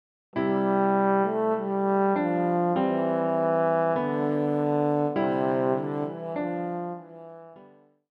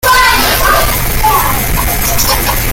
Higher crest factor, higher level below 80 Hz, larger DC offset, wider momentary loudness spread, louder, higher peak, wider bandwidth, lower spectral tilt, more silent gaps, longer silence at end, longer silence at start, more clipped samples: about the same, 14 dB vs 10 dB; second, -74 dBFS vs -18 dBFS; neither; first, 9 LU vs 5 LU; second, -26 LUFS vs -9 LUFS; second, -12 dBFS vs 0 dBFS; second, 5.2 kHz vs 17.5 kHz; first, -10 dB/octave vs -2.5 dB/octave; neither; first, 0.5 s vs 0 s; first, 0.35 s vs 0.05 s; neither